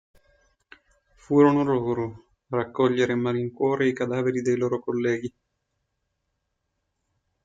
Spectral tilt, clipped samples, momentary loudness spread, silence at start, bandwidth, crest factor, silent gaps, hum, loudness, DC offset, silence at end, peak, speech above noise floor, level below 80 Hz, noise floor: -7 dB/octave; under 0.1%; 11 LU; 1.3 s; 7.8 kHz; 18 dB; none; none; -24 LUFS; under 0.1%; 2.15 s; -8 dBFS; 55 dB; -64 dBFS; -78 dBFS